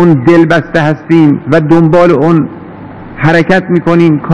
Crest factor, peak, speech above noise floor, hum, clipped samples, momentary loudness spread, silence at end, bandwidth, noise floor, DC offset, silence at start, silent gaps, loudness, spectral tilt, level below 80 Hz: 8 dB; 0 dBFS; 20 dB; none; 7%; 14 LU; 0 s; 8.2 kHz; -26 dBFS; 2%; 0 s; none; -8 LUFS; -8.5 dB/octave; -38 dBFS